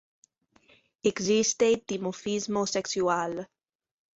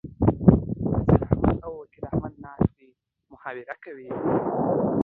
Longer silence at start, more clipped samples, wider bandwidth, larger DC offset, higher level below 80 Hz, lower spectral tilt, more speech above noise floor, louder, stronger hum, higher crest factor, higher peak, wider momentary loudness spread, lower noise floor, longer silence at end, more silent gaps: first, 1.05 s vs 0.05 s; neither; first, 8 kHz vs 3.8 kHz; neither; second, -68 dBFS vs -38 dBFS; second, -3.5 dB/octave vs -13 dB/octave; about the same, 36 dB vs 35 dB; second, -27 LUFS vs -24 LUFS; neither; second, 18 dB vs 24 dB; second, -12 dBFS vs 0 dBFS; second, 10 LU vs 19 LU; about the same, -63 dBFS vs -61 dBFS; first, 0.7 s vs 0 s; neither